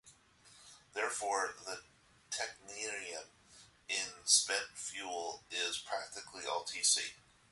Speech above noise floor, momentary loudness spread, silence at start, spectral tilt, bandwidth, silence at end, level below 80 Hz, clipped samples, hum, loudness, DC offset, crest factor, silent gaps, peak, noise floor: 25 dB; 17 LU; 0.05 s; 1.5 dB/octave; 12 kHz; 0.35 s; -78 dBFS; under 0.1%; none; -36 LUFS; under 0.1%; 26 dB; none; -14 dBFS; -64 dBFS